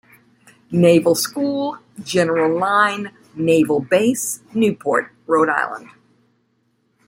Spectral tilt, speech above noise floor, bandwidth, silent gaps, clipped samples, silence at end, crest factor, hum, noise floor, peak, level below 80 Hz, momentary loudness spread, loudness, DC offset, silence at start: -5 dB/octave; 47 dB; 16.5 kHz; none; under 0.1%; 1.25 s; 18 dB; none; -65 dBFS; -2 dBFS; -62 dBFS; 11 LU; -18 LUFS; under 0.1%; 0.7 s